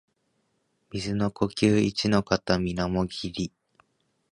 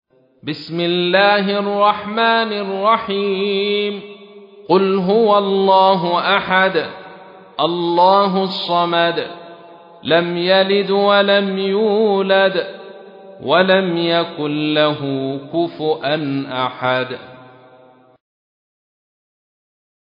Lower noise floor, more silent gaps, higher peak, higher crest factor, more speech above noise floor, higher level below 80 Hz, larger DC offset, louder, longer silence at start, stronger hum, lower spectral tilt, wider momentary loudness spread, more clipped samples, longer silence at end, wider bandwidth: first, -73 dBFS vs -47 dBFS; neither; second, -4 dBFS vs 0 dBFS; first, 24 dB vs 16 dB; first, 47 dB vs 32 dB; first, -48 dBFS vs -66 dBFS; neither; second, -26 LUFS vs -16 LUFS; first, 0.95 s vs 0.45 s; neither; second, -6 dB/octave vs -8 dB/octave; about the same, 12 LU vs 12 LU; neither; second, 0.85 s vs 2.75 s; first, 11 kHz vs 5.4 kHz